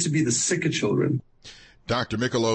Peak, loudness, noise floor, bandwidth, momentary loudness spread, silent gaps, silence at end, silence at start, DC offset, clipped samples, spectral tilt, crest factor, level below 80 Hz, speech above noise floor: -12 dBFS; -24 LUFS; -48 dBFS; 8.8 kHz; 7 LU; none; 0 s; 0 s; under 0.1%; under 0.1%; -4 dB/octave; 12 dB; -54 dBFS; 25 dB